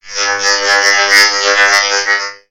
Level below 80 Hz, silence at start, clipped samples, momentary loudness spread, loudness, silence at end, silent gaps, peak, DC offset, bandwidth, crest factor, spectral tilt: -56 dBFS; 0.05 s; 0.2%; 7 LU; -9 LUFS; 0.15 s; none; 0 dBFS; under 0.1%; over 20 kHz; 12 dB; 2 dB/octave